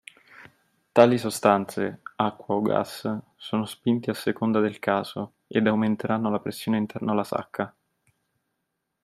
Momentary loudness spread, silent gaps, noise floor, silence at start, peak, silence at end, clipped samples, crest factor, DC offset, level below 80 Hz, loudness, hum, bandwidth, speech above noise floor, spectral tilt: 11 LU; none; -80 dBFS; 0.4 s; -2 dBFS; 1.35 s; under 0.1%; 24 dB; under 0.1%; -70 dBFS; -25 LUFS; none; 15 kHz; 55 dB; -6 dB/octave